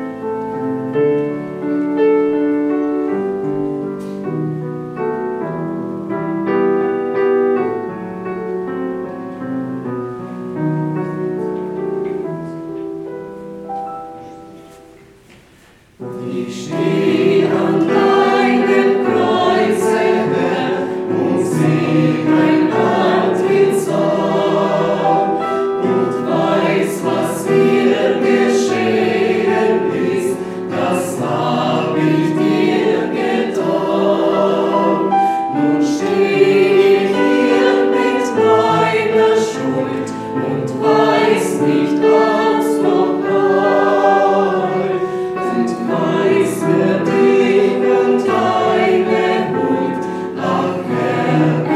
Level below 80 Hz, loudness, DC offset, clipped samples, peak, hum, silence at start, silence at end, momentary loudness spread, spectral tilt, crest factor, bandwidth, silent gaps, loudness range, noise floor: -56 dBFS; -15 LUFS; under 0.1%; under 0.1%; 0 dBFS; none; 0 s; 0 s; 11 LU; -6.5 dB/octave; 16 dB; 13.5 kHz; none; 9 LU; -47 dBFS